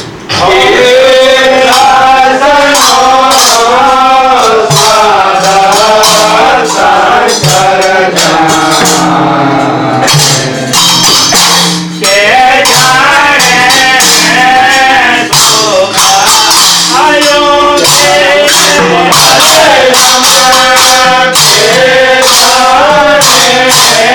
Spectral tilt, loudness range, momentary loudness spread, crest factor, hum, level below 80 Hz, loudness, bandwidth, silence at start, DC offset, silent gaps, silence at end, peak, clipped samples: -1.5 dB/octave; 3 LU; 4 LU; 4 dB; none; -38 dBFS; -3 LUFS; over 20 kHz; 0 s; under 0.1%; none; 0 s; 0 dBFS; 2%